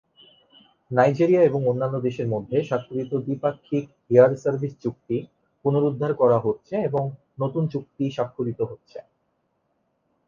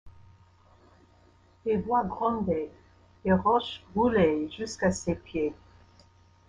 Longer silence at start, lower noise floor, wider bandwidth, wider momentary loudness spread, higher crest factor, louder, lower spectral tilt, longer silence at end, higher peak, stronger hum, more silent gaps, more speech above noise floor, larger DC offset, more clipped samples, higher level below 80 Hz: first, 0.9 s vs 0.05 s; first, -72 dBFS vs -60 dBFS; second, 7.2 kHz vs 10 kHz; about the same, 12 LU vs 10 LU; about the same, 20 dB vs 18 dB; first, -23 LUFS vs -28 LUFS; first, -9 dB/octave vs -6 dB/octave; first, 1.25 s vs 0.95 s; first, -4 dBFS vs -10 dBFS; neither; neither; first, 49 dB vs 33 dB; neither; neither; second, -64 dBFS vs -54 dBFS